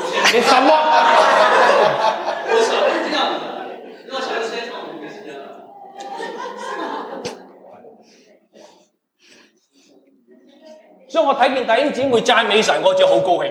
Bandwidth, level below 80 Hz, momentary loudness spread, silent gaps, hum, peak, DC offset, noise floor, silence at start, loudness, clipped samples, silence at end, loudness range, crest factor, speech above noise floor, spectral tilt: 15 kHz; -70 dBFS; 20 LU; none; none; -2 dBFS; under 0.1%; -57 dBFS; 0 s; -16 LUFS; under 0.1%; 0 s; 17 LU; 18 dB; 43 dB; -2.5 dB/octave